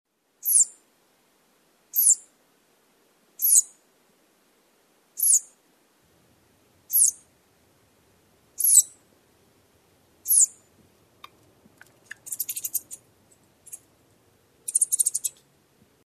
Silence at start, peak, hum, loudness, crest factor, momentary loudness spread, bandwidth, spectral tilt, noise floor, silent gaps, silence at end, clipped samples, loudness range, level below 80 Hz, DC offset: 0.45 s; -4 dBFS; none; -20 LUFS; 24 dB; 26 LU; 14 kHz; 3 dB/octave; -64 dBFS; none; 0.75 s; under 0.1%; 10 LU; -78 dBFS; under 0.1%